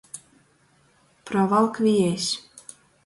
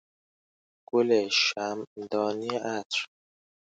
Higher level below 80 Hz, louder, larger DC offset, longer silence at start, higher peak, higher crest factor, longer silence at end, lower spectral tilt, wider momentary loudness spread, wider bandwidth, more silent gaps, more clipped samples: first, -66 dBFS vs -78 dBFS; first, -22 LUFS vs -28 LUFS; neither; second, 0.15 s vs 0.95 s; first, -8 dBFS vs -12 dBFS; about the same, 18 dB vs 18 dB; second, 0.45 s vs 0.75 s; first, -5 dB/octave vs -3 dB/octave; first, 23 LU vs 10 LU; first, 11.5 kHz vs 9.2 kHz; second, none vs 1.87-1.96 s, 2.85-2.90 s; neither